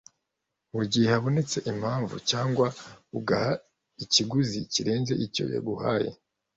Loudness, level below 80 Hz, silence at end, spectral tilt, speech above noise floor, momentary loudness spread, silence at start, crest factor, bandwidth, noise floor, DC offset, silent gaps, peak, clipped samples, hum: -27 LUFS; -62 dBFS; 0.4 s; -4.5 dB/octave; 56 dB; 11 LU; 0.75 s; 20 dB; 8 kHz; -83 dBFS; under 0.1%; none; -8 dBFS; under 0.1%; none